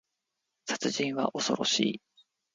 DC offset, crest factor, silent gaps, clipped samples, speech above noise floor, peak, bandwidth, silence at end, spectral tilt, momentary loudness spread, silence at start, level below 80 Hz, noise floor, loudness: under 0.1%; 22 dB; none; under 0.1%; 54 dB; -10 dBFS; 9.6 kHz; 0.55 s; -3 dB/octave; 12 LU; 0.65 s; -74 dBFS; -84 dBFS; -29 LUFS